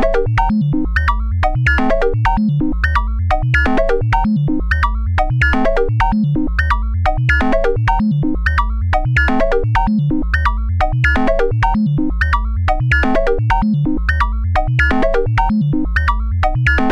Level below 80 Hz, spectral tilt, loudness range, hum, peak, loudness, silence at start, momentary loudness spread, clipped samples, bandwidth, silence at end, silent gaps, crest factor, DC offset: -20 dBFS; -8 dB/octave; 1 LU; none; -2 dBFS; -16 LUFS; 0 s; 3 LU; under 0.1%; 8.6 kHz; 0 s; none; 12 dB; under 0.1%